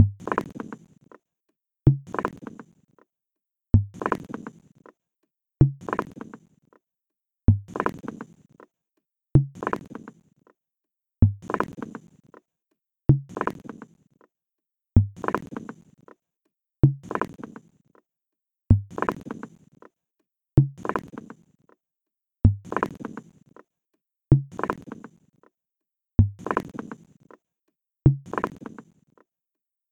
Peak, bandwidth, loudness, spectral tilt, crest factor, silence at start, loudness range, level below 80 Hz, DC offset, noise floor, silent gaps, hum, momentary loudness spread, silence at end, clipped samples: -2 dBFS; 7.6 kHz; -25 LUFS; -9.5 dB/octave; 26 dB; 0 s; 3 LU; -40 dBFS; under 0.1%; -87 dBFS; none; none; 21 LU; 1.25 s; under 0.1%